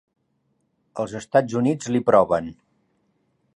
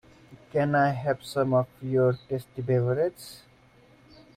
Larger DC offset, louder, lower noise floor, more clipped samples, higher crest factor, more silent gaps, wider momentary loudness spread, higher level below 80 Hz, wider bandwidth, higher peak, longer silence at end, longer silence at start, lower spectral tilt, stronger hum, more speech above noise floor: neither; first, -21 LUFS vs -27 LUFS; first, -70 dBFS vs -57 dBFS; neither; first, 22 dB vs 16 dB; neither; first, 15 LU vs 9 LU; about the same, -58 dBFS vs -62 dBFS; second, 11 kHz vs 15.5 kHz; first, -2 dBFS vs -12 dBFS; about the same, 1.05 s vs 1 s; first, 0.95 s vs 0.3 s; about the same, -6.5 dB/octave vs -7.5 dB/octave; neither; first, 50 dB vs 31 dB